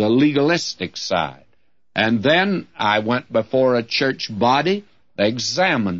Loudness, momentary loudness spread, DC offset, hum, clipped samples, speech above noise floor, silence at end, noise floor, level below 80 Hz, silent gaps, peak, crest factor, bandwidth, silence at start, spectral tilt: -19 LUFS; 9 LU; 0.2%; none; under 0.1%; 48 dB; 0 s; -67 dBFS; -60 dBFS; none; -4 dBFS; 16 dB; 7.8 kHz; 0 s; -4.5 dB/octave